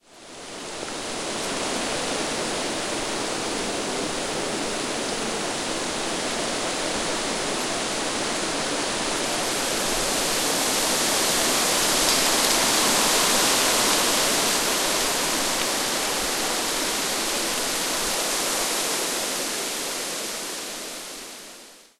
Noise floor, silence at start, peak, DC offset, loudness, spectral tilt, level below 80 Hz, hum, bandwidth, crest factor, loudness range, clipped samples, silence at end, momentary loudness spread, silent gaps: -46 dBFS; 0.1 s; -4 dBFS; 0.3%; -23 LUFS; -1 dB/octave; -48 dBFS; none; 16 kHz; 22 dB; 8 LU; under 0.1%; 0.2 s; 11 LU; none